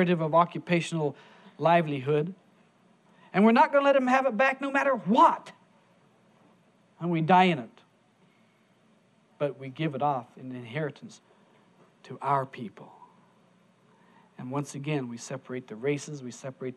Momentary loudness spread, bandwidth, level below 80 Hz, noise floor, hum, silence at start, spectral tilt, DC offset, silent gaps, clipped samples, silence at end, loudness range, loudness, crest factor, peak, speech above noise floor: 18 LU; 11.5 kHz; -82 dBFS; -64 dBFS; none; 0 s; -6.5 dB/octave; under 0.1%; none; under 0.1%; 0.05 s; 12 LU; -26 LUFS; 20 dB; -8 dBFS; 37 dB